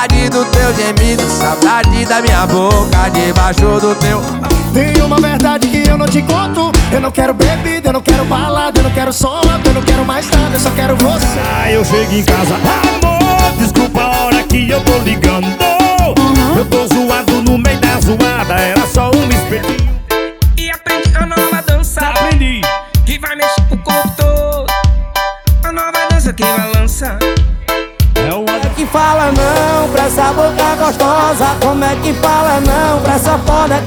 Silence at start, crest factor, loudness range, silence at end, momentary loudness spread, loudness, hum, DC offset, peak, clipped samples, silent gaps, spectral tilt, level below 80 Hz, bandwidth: 0 s; 10 dB; 2 LU; 0 s; 4 LU; -11 LUFS; none; under 0.1%; 0 dBFS; under 0.1%; none; -5 dB/octave; -16 dBFS; over 20 kHz